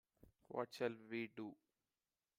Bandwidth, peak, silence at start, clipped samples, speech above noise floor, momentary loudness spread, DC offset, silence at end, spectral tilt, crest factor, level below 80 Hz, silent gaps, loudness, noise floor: 16 kHz; -28 dBFS; 0.25 s; under 0.1%; over 43 dB; 9 LU; under 0.1%; 0.85 s; -5.5 dB/octave; 22 dB; -84 dBFS; none; -48 LUFS; under -90 dBFS